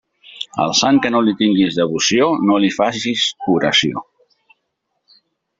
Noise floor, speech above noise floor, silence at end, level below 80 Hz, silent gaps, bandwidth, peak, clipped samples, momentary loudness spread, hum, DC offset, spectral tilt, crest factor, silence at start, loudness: -72 dBFS; 57 dB; 1.6 s; -58 dBFS; none; 7.8 kHz; -2 dBFS; under 0.1%; 8 LU; none; under 0.1%; -3.5 dB/octave; 16 dB; 0.3 s; -16 LUFS